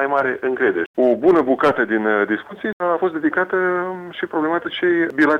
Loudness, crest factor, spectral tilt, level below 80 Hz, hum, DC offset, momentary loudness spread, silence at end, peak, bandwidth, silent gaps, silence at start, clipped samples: -19 LUFS; 14 dB; -7 dB/octave; -60 dBFS; none; under 0.1%; 8 LU; 0 s; -4 dBFS; 6.8 kHz; 0.86-0.94 s, 2.73-2.80 s; 0 s; under 0.1%